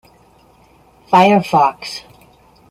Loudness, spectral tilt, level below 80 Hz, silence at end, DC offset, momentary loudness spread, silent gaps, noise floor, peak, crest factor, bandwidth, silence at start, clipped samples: -13 LUFS; -6 dB/octave; -56 dBFS; 0.7 s; under 0.1%; 17 LU; none; -50 dBFS; -2 dBFS; 16 dB; 15.5 kHz; 1.1 s; under 0.1%